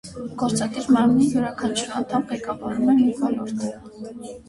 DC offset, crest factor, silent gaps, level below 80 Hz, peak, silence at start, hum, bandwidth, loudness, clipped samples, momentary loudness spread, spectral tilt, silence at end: under 0.1%; 16 dB; none; -54 dBFS; -6 dBFS; 0.05 s; none; 11.5 kHz; -22 LUFS; under 0.1%; 16 LU; -5 dB/octave; 0.05 s